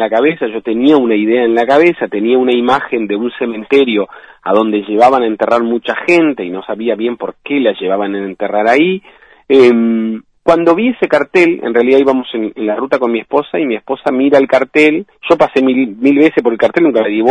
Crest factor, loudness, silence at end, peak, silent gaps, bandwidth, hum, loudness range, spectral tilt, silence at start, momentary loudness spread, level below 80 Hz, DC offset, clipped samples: 12 dB; -12 LUFS; 0 s; 0 dBFS; none; 10 kHz; none; 3 LU; -6.5 dB/octave; 0 s; 8 LU; -54 dBFS; 0.1%; 0.4%